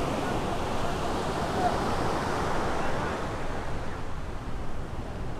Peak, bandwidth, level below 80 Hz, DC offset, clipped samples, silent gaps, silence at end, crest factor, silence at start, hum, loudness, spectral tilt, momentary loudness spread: -14 dBFS; 13.5 kHz; -38 dBFS; under 0.1%; under 0.1%; none; 0 s; 16 dB; 0 s; none; -31 LUFS; -5.5 dB/octave; 10 LU